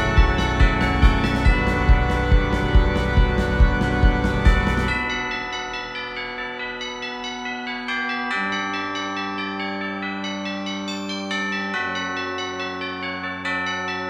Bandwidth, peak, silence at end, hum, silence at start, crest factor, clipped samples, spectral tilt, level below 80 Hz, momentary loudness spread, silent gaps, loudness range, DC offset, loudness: 9.4 kHz; -2 dBFS; 0 s; none; 0 s; 20 dB; under 0.1%; -5.5 dB/octave; -24 dBFS; 9 LU; none; 7 LU; under 0.1%; -22 LUFS